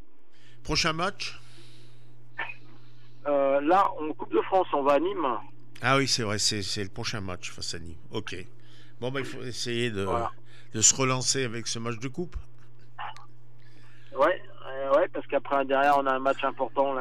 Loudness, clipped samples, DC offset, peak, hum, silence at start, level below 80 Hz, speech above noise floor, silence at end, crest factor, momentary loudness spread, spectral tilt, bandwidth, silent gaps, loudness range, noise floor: -27 LUFS; under 0.1%; 2%; -6 dBFS; none; 0.65 s; -54 dBFS; 33 dB; 0 s; 22 dB; 16 LU; -3 dB/octave; 14.5 kHz; none; 7 LU; -61 dBFS